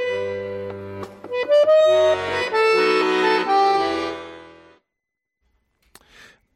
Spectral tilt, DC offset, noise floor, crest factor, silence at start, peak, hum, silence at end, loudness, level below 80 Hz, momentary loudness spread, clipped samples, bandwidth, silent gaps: -4 dB/octave; under 0.1%; -82 dBFS; 12 dB; 0 s; -8 dBFS; none; 2.05 s; -19 LUFS; -62 dBFS; 18 LU; under 0.1%; 12 kHz; none